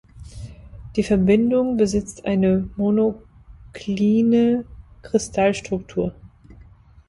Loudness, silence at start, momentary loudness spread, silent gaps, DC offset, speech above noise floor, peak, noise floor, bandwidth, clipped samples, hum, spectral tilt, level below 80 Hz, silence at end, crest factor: -20 LUFS; 0.15 s; 22 LU; none; under 0.1%; 28 dB; -4 dBFS; -48 dBFS; 11.5 kHz; under 0.1%; none; -6.5 dB/octave; -44 dBFS; 0.8 s; 16 dB